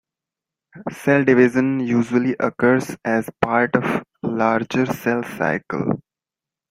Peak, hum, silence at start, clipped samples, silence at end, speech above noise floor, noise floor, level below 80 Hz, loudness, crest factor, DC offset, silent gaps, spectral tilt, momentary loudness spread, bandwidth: 0 dBFS; none; 0.75 s; under 0.1%; 0.7 s; 69 dB; -89 dBFS; -58 dBFS; -20 LUFS; 20 dB; under 0.1%; none; -7 dB/octave; 10 LU; 16 kHz